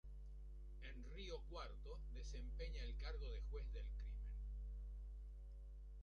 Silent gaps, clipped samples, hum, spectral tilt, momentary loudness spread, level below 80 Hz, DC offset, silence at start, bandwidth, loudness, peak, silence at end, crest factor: none; under 0.1%; 50 Hz at -50 dBFS; -5.5 dB/octave; 8 LU; -50 dBFS; under 0.1%; 0.05 s; 6.8 kHz; -54 LUFS; -38 dBFS; 0 s; 12 dB